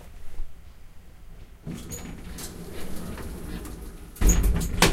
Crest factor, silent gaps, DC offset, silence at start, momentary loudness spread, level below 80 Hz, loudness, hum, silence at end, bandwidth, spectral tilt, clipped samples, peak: 24 dB; none; under 0.1%; 0 s; 23 LU; -30 dBFS; -30 LUFS; none; 0 s; 16.5 kHz; -4 dB/octave; under 0.1%; -4 dBFS